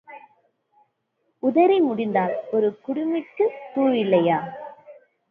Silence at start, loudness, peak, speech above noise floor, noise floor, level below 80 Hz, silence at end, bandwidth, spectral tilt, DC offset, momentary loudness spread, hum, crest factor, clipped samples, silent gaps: 0.1 s; -22 LUFS; -6 dBFS; 52 dB; -73 dBFS; -74 dBFS; 0.4 s; 4.2 kHz; -9.5 dB/octave; under 0.1%; 9 LU; none; 18 dB; under 0.1%; none